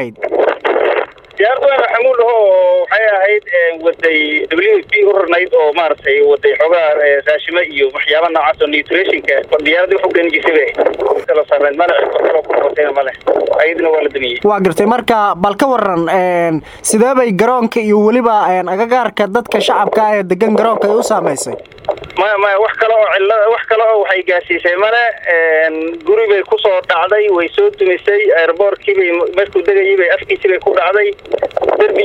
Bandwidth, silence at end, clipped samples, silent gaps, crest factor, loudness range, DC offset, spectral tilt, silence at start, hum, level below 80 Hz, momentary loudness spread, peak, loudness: 17 kHz; 0 s; under 0.1%; none; 12 dB; 2 LU; under 0.1%; -4 dB/octave; 0 s; none; -52 dBFS; 4 LU; 0 dBFS; -12 LUFS